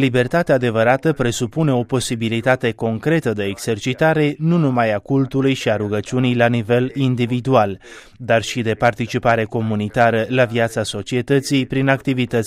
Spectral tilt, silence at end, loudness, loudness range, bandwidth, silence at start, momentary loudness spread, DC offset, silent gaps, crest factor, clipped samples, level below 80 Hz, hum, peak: -6 dB/octave; 0 s; -18 LUFS; 1 LU; 15 kHz; 0 s; 6 LU; under 0.1%; none; 16 dB; under 0.1%; -48 dBFS; none; -2 dBFS